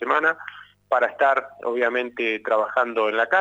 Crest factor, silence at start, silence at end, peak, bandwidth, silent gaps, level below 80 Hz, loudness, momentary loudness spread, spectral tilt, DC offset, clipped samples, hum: 16 dB; 0 s; 0 s; -6 dBFS; 8 kHz; none; -72 dBFS; -22 LUFS; 6 LU; -4 dB/octave; under 0.1%; under 0.1%; 50 Hz at -65 dBFS